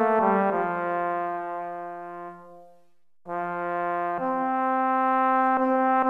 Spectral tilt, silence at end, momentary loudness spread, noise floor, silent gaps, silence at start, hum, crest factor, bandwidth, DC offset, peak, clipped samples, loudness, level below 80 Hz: -8.5 dB/octave; 0 s; 14 LU; -67 dBFS; none; 0 s; none; 16 dB; 4.4 kHz; under 0.1%; -10 dBFS; under 0.1%; -25 LUFS; -72 dBFS